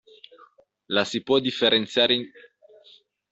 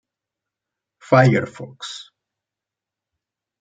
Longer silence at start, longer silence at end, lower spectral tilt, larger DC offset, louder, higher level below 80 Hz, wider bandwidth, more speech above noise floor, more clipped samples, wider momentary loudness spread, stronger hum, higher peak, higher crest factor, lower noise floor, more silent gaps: second, 0.9 s vs 1.1 s; second, 1.05 s vs 1.6 s; second, -4 dB/octave vs -7 dB/octave; neither; second, -22 LUFS vs -16 LUFS; about the same, -68 dBFS vs -64 dBFS; second, 8 kHz vs 9 kHz; second, 33 dB vs 69 dB; neither; second, 6 LU vs 19 LU; neither; second, -6 dBFS vs -2 dBFS; about the same, 20 dB vs 22 dB; second, -56 dBFS vs -87 dBFS; neither